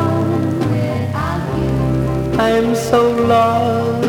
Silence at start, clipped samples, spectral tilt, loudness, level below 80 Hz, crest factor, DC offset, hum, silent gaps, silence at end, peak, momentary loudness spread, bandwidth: 0 s; under 0.1%; -7 dB/octave; -16 LUFS; -34 dBFS; 14 dB; under 0.1%; none; none; 0 s; -2 dBFS; 6 LU; 18 kHz